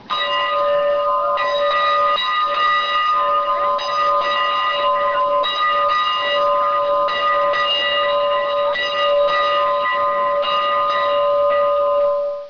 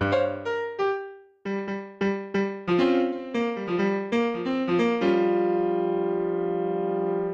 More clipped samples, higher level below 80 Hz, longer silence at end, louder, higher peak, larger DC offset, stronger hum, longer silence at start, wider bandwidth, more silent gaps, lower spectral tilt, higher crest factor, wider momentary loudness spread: neither; first, -56 dBFS vs -64 dBFS; about the same, 0 s vs 0 s; first, -17 LUFS vs -26 LUFS; first, -8 dBFS vs -12 dBFS; first, 0.2% vs under 0.1%; neither; about the same, 0 s vs 0 s; second, 5.4 kHz vs 7.2 kHz; neither; second, -2.5 dB/octave vs -7.5 dB/octave; about the same, 10 dB vs 14 dB; second, 2 LU vs 8 LU